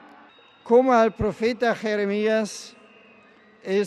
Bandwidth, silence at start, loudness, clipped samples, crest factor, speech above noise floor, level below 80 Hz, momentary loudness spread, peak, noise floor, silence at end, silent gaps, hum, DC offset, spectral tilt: 12 kHz; 0.65 s; -22 LUFS; under 0.1%; 18 dB; 32 dB; -52 dBFS; 17 LU; -6 dBFS; -53 dBFS; 0 s; none; none; under 0.1%; -5.5 dB/octave